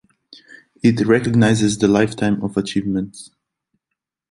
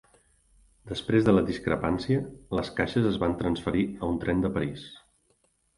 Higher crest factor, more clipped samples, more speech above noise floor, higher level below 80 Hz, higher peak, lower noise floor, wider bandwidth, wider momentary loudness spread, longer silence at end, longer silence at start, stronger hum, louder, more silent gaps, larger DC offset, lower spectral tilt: about the same, 18 dB vs 20 dB; neither; first, 64 dB vs 43 dB; about the same, -50 dBFS vs -46 dBFS; first, -2 dBFS vs -8 dBFS; first, -81 dBFS vs -69 dBFS; about the same, 11.5 kHz vs 11.5 kHz; second, 8 LU vs 11 LU; first, 1.05 s vs 0.8 s; about the same, 0.85 s vs 0.85 s; neither; first, -17 LUFS vs -27 LUFS; neither; neither; second, -6 dB/octave vs -7.5 dB/octave